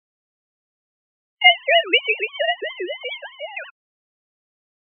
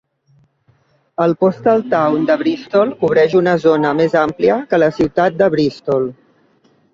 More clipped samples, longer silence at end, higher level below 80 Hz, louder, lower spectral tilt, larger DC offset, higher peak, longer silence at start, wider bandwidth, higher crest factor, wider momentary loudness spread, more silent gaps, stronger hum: neither; first, 1.25 s vs 0.8 s; second, under -90 dBFS vs -52 dBFS; second, -18 LUFS vs -15 LUFS; second, 7.5 dB/octave vs -7.5 dB/octave; neither; about the same, 0 dBFS vs -2 dBFS; first, 1.4 s vs 1.2 s; second, 3.6 kHz vs 7.4 kHz; first, 24 dB vs 14 dB; first, 18 LU vs 5 LU; neither; neither